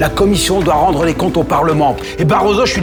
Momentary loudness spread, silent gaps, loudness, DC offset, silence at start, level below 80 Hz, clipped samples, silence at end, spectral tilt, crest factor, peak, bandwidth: 3 LU; none; -13 LUFS; under 0.1%; 0 s; -28 dBFS; under 0.1%; 0 s; -5 dB/octave; 12 dB; 0 dBFS; over 20 kHz